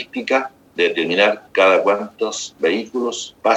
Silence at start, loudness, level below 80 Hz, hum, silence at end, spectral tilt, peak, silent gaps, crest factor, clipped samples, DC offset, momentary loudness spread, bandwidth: 0 s; -18 LUFS; -68 dBFS; none; 0 s; -2.5 dB/octave; 0 dBFS; none; 18 dB; under 0.1%; under 0.1%; 10 LU; 9.8 kHz